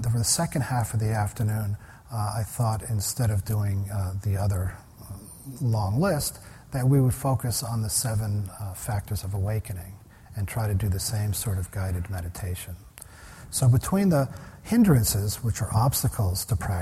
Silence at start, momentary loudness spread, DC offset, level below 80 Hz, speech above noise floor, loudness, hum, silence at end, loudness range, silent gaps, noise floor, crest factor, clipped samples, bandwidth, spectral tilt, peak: 0 s; 16 LU; under 0.1%; -44 dBFS; 20 dB; -26 LUFS; none; 0 s; 6 LU; none; -46 dBFS; 18 dB; under 0.1%; 16 kHz; -5.5 dB/octave; -8 dBFS